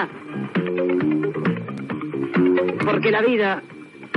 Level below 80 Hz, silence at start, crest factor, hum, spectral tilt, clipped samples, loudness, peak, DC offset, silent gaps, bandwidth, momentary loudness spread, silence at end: -68 dBFS; 0 s; 14 dB; none; -8 dB/octave; under 0.1%; -22 LUFS; -6 dBFS; under 0.1%; none; 6 kHz; 11 LU; 0 s